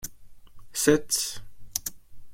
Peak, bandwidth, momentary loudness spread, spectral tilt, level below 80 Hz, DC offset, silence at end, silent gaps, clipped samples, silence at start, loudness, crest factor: -6 dBFS; 16.5 kHz; 17 LU; -3 dB/octave; -52 dBFS; under 0.1%; 0 s; none; under 0.1%; 0 s; -27 LUFS; 24 dB